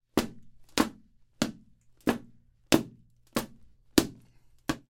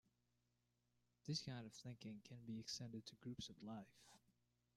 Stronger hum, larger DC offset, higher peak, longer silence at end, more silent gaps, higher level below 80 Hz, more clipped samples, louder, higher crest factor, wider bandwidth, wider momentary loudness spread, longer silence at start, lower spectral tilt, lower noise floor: second, none vs 60 Hz at -75 dBFS; neither; first, -4 dBFS vs -34 dBFS; second, 0.1 s vs 0.6 s; neither; first, -54 dBFS vs -82 dBFS; neither; first, -31 LUFS vs -53 LUFS; first, 28 dB vs 20 dB; about the same, 16.5 kHz vs 15.5 kHz; about the same, 12 LU vs 10 LU; second, 0.15 s vs 1.25 s; about the same, -4 dB/octave vs -4.5 dB/octave; second, -59 dBFS vs -87 dBFS